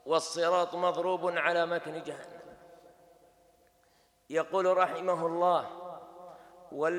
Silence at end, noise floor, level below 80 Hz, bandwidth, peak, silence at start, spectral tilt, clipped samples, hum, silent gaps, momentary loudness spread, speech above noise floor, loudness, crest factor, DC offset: 0 s; -67 dBFS; -78 dBFS; 12.5 kHz; -12 dBFS; 0.05 s; -4 dB/octave; under 0.1%; none; none; 20 LU; 37 dB; -30 LUFS; 20 dB; under 0.1%